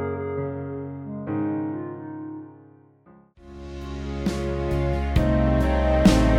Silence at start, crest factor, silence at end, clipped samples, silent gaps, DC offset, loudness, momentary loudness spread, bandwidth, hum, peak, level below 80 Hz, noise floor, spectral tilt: 0 s; 18 dB; 0 s; under 0.1%; none; under 0.1%; -25 LUFS; 17 LU; 13.5 kHz; none; -6 dBFS; -30 dBFS; -54 dBFS; -7 dB/octave